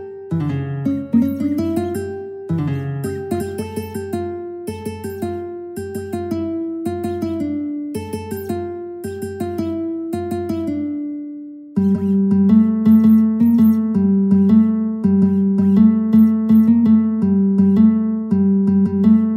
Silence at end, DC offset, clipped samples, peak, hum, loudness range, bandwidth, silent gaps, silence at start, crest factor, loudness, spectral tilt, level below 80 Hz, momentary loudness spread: 0 s; under 0.1%; under 0.1%; -2 dBFS; none; 11 LU; 15.5 kHz; none; 0 s; 14 dB; -17 LUFS; -9 dB/octave; -52 dBFS; 15 LU